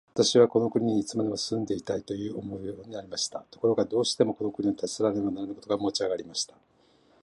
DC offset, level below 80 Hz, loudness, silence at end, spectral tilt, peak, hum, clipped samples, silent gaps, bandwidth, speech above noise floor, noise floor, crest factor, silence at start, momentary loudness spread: under 0.1%; -64 dBFS; -28 LUFS; 0.75 s; -4.5 dB/octave; -6 dBFS; none; under 0.1%; none; 11.5 kHz; 35 dB; -62 dBFS; 22 dB; 0.15 s; 13 LU